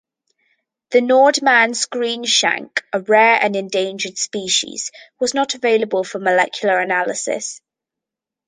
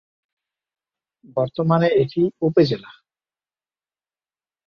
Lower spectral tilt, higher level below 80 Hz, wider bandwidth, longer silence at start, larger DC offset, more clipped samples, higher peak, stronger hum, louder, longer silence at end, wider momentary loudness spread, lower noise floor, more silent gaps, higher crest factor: second, -1.5 dB/octave vs -9 dB/octave; second, -70 dBFS vs -62 dBFS; first, 10 kHz vs 6.6 kHz; second, 0.9 s vs 1.35 s; neither; neither; about the same, -2 dBFS vs -4 dBFS; neither; first, -17 LUFS vs -20 LUFS; second, 0.9 s vs 1.8 s; about the same, 11 LU vs 9 LU; second, -85 dBFS vs under -90 dBFS; neither; about the same, 16 dB vs 20 dB